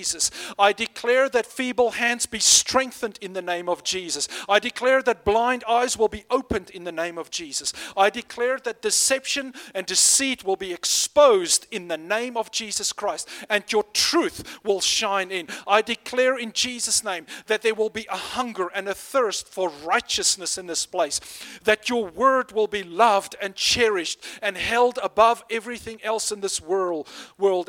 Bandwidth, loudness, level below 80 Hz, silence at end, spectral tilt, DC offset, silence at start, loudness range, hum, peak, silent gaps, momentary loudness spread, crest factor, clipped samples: 17.5 kHz; -22 LUFS; -56 dBFS; 0.05 s; -1 dB/octave; under 0.1%; 0 s; 4 LU; none; -2 dBFS; none; 10 LU; 22 dB; under 0.1%